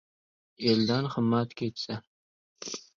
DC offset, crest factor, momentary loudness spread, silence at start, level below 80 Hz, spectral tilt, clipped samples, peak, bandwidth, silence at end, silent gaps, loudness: under 0.1%; 20 dB; 13 LU; 0.6 s; -66 dBFS; -5.5 dB/octave; under 0.1%; -10 dBFS; 7.4 kHz; 0.15 s; 2.07-2.56 s; -29 LUFS